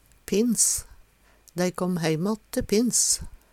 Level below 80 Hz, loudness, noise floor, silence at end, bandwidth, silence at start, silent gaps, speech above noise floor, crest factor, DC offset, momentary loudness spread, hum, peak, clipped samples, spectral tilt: -48 dBFS; -24 LUFS; -57 dBFS; 0.15 s; 17.5 kHz; 0.3 s; none; 33 dB; 20 dB; under 0.1%; 9 LU; none; -6 dBFS; under 0.1%; -3.5 dB/octave